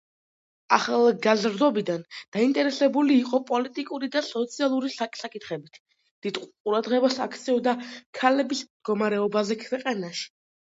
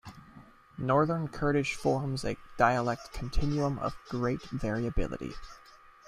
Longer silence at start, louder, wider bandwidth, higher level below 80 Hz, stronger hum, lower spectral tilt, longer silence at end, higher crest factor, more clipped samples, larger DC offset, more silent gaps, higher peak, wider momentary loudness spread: first, 0.7 s vs 0.05 s; first, -25 LUFS vs -31 LUFS; second, 8 kHz vs 13.5 kHz; second, -78 dBFS vs -42 dBFS; neither; second, -4.5 dB/octave vs -6.5 dB/octave; about the same, 0.35 s vs 0.3 s; about the same, 22 dB vs 22 dB; neither; neither; first, 2.28-2.32 s, 5.80-5.85 s, 6.11-6.22 s, 6.60-6.65 s, 8.06-8.13 s, 8.70-8.80 s vs none; first, -4 dBFS vs -10 dBFS; about the same, 12 LU vs 13 LU